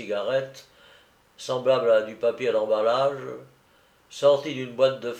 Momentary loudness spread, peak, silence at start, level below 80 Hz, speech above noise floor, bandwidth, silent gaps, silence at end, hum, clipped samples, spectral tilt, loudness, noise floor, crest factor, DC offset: 18 LU; -6 dBFS; 0 s; -74 dBFS; 36 dB; 9.4 kHz; none; 0 s; none; under 0.1%; -5 dB/octave; -24 LUFS; -60 dBFS; 18 dB; under 0.1%